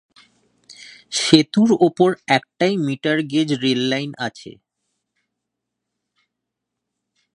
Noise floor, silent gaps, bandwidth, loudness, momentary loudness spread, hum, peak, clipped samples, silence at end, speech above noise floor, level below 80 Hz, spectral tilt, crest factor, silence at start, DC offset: -81 dBFS; none; 11 kHz; -18 LUFS; 12 LU; none; 0 dBFS; under 0.1%; 2.85 s; 63 dB; -66 dBFS; -4.5 dB/octave; 22 dB; 0.7 s; under 0.1%